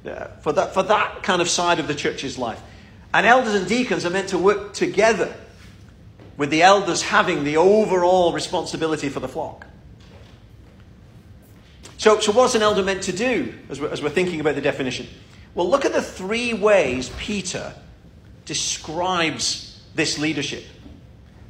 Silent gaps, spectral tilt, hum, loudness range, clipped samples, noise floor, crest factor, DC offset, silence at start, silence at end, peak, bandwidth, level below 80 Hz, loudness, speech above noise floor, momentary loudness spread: none; -3.5 dB/octave; none; 6 LU; under 0.1%; -46 dBFS; 20 dB; under 0.1%; 0.05 s; 0.35 s; 0 dBFS; 15.5 kHz; -48 dBFS; -20 LUFS; 26 dB; 13 LU